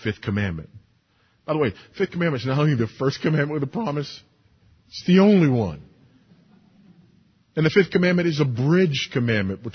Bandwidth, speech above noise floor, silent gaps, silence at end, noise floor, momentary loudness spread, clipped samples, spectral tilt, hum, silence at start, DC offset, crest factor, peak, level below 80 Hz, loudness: 6.6 kHz; 42 dB; none; 0 s; -63 dBFS; 13 LU; under 0.1%; -7 dB/octave; none; 0 s; under 0.1%; 18 dB; -4 dBFS; -50 dBFS; -22 LUFS